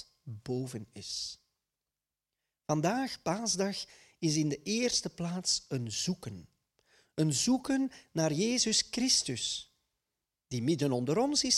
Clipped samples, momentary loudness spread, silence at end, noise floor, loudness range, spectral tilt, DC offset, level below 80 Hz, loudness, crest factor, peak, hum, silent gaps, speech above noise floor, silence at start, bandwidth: under 0.1%; 14 LU; 0 s; under -90 dBFS; 5 LU; -3.5 dB/octave; under 0.1%; -66 dBFS; -32 LUFS; 20 dB; -14 dBFS; none; none; over 58 dB; 0 s; 14.5 kHz